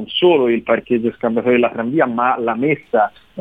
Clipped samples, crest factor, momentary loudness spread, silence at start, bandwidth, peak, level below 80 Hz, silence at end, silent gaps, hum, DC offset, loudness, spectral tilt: under 0.1%; 14 dB; 5 LU; 0 s; 3.9 kHz; -2 dBFS; -58 dBFS; 0 s; none; none; 0.1%; -17 LUFS; -8 dB/octave